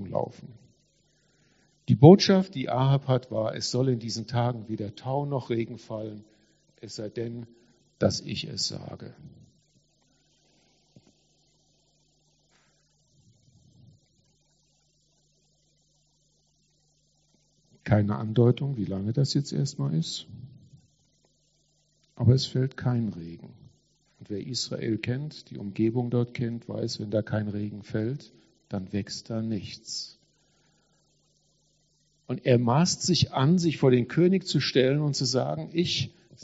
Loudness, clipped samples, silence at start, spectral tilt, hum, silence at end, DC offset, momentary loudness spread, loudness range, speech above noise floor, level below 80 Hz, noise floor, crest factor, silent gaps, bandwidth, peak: -26 LUFS; under 0.1%; 0 s; -6 dB/octave; none; 0 s; under 0.1%; 16 LU; 12 LU; 43 dB; -64 dBFS; -69 dBFS; 26 dB; none; 8 kHz; -2 dBFS